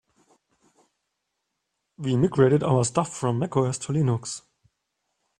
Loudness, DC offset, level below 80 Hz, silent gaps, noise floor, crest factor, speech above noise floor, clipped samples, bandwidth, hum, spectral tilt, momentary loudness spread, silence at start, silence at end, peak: -24 LUFS; under 0.1%; -60 dBFS; none; -80 dBFS; 20 dB; 57 dB; under 0.1%; 10.5 kHz; none; -6.5 dB/octave; 12 LU; 2 s; 1 s; -6 dBFS